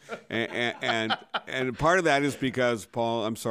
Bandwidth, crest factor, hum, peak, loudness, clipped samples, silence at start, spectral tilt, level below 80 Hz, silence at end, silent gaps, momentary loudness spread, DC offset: 15.5 kHz; 18 dB; none; -10 dBFS; -27 LUFS; under 0.1%; 0.1 s; -4.5 dB/octave; -56 dBFS; 0 s; none; 8 LU; under 0.1%